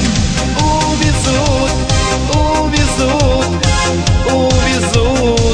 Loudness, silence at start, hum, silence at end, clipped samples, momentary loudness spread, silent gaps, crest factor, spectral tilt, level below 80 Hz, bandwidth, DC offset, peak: -13 LUFS; 0 s; none; 0 s; under 0.1%; 2 LU; none; 12 dB; -4.5 dB/octave; -18 dBFS; 10.5 kHz; under 0.1%; 0 dBFS